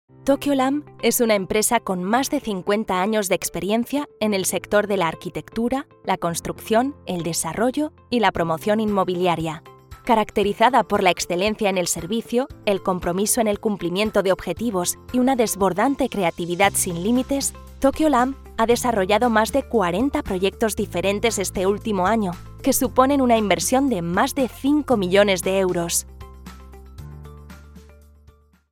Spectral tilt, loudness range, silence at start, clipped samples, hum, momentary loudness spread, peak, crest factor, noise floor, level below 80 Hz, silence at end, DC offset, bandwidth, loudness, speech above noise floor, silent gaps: -4 dB/octave; 3 LU; 0.25 s; under 0.1%; none; 8 LU; -2 dBFS; 20 dB; -53 dBFS; -44 dBFS; 0.9 s; under 0.1%; 18.5 kHz; -21 LUFS; 32 dB; none